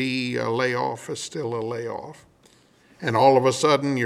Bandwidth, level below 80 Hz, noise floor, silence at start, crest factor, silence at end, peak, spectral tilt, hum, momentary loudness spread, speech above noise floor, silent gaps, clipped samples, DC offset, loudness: 14 kHz; -68 dBFS; -57 dBFS; 0 s; 20 dB; 0 s; -4 dBFS; -5 dB/octave; none; 14 LU; 34 dB; none; under 0.1%; under 0.1%; -23 LUFS